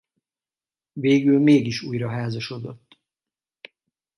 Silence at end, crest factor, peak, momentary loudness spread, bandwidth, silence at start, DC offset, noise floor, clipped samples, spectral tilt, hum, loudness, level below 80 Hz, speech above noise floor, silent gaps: 1.4 s; 18 dB; -6 dBFS; 19 LU; 11.5 kHz; 0.95 s; under 0.1%; under -90 dBFS; under 0.1%; -7 dB/octave; none; -21 LUFS; -64 dBFS; over 70 dB; none